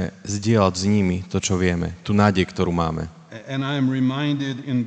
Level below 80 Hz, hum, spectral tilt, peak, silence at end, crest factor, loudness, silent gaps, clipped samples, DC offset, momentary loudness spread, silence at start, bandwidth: -46 dBFS; none; -6 dB/octave; -2 dBFS; 0 s; 20 dB; -22 LUFS; none; under 0.1%; under 0.1%; 9 LU; 0 s; 9.2 kHz